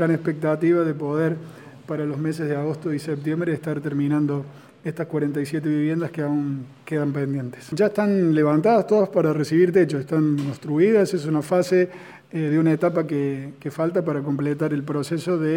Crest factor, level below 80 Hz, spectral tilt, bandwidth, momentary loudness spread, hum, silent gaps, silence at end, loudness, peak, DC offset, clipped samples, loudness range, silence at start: 16 dB; -68 dBFS; -8 dB/octave; 16.5 kHz; 11 LU; none; none; 0 s; -22 LUFS; -6 dBFS; under 0.1%; under 0.1%; 6 LU; 0 s